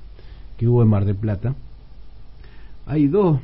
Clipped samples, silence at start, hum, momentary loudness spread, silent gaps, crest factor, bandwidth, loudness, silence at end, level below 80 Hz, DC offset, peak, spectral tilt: under 0.1%; 0 s; none; 10 LU; none; 14 dB; 4.8 kHz; -20 LUFS; 0 s; -40 dBFS; under 0.1%; -6 dBFS; -14 dB/octave